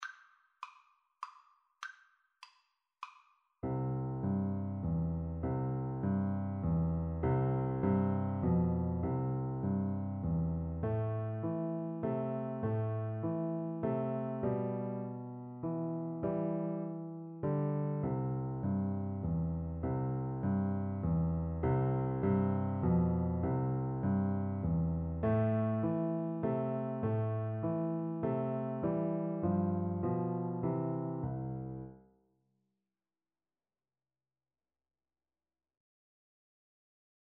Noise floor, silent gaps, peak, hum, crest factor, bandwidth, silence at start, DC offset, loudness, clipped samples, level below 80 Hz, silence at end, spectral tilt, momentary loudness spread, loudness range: under -90 dBFS; none; -20 dBFS; none; 16 dB; 6 kHz; 0 s; under 0.1%; -35 LUFS; under 0.1%; -52 dBFS; 5.3 s; -10.5 dB/octave; 9 LU; 7 LU